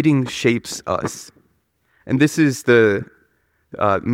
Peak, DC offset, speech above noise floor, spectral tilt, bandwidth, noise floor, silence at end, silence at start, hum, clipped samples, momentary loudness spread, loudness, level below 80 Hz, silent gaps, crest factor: -2 dBFS; under 0.1%; 47 dB; -5.5 dB/octave; 16.5 kHz; -64 dBFS; 0 s; 0 s; none; under 0.1%; 15 LU; -18 LUFS; -56 dBFS; none; 16 dB